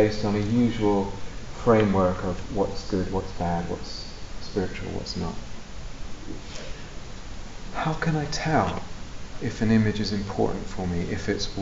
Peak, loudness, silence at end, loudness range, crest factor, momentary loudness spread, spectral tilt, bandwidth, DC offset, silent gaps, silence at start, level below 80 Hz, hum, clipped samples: -6 dBFS; -26 LUFS; 0 s; 10 LU; 20 dB; 19 LU; -6 dB/octave; 8 kHz; under 0.1%; none; 0 s; -38 dBFS; none; under 0.1%